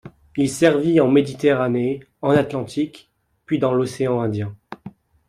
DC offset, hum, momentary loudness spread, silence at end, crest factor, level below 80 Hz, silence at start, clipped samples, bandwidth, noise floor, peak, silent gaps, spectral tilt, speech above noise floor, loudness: under 0.1%; none; 14 LU; 0.4 s; 18 dB; -56 dBFS; 0.05 s; under 0.1%; 14 kHz; -42 dBFS; -2 dBFS; none; -6.5 dB/octave; 23 dB; -20 LUFS